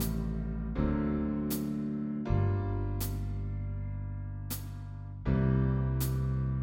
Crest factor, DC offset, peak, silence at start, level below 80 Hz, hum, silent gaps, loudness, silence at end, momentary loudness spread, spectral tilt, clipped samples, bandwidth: 16 dB; under 0.1%; -16 dBFS; 0 s; -38 dBFS; none; none; -33 LUFS; 0 s; 9 LU; -7.5 dB/octave; under 0.1%; 17 kHz